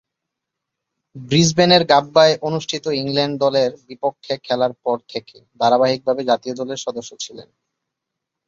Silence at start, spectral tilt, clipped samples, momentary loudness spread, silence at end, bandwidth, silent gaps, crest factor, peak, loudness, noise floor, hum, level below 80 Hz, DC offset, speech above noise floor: 1.15 s; -4.5 dB/octave; under 0.1%; 15 LU; 1.05 s; 7.8 kHz; none; 18 dB; -2 dBFS; -18 LUFS; -81 dBFS; none; -58 dBFS; under 0.1%; 63 dB